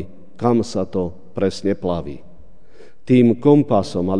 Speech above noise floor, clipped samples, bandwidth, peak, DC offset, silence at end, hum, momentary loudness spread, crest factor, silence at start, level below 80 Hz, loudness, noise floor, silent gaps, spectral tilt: 32 dB; under 0.1%; 10 kHz; 0 dBFS; 2%; 0 s; none; 14 LU; 18 dB; 0 s; -50 dBFS; -18 LUFS; -49 dBFS; none; -7.5 dB/octave